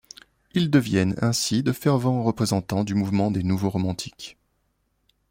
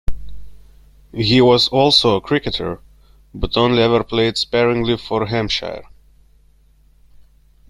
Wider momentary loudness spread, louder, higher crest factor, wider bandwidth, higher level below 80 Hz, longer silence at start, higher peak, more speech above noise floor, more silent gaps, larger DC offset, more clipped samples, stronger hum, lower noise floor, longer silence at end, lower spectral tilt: second, 8 LU vs 17 LU; second, -23 LUFS vs -16 LUFS; about the same, 18 dB vs 18 dB; first, 16.5 kHz vs 13.5 kHz; second, -56 dBFS vs -36 dBFS; first, 0.55 s vs 0.1 s; second, -6 dBFS vs 0 dBFS; first, 48 dB vs 36 dB; neither; neither; neither; first, 50 Hz at -45 dBFS vs none; first, -71 dBFS vs -52 dBFS; second, 1 s vs 1.85 s; about the same, -5.5 dB/octave vs -5.5 dB/octave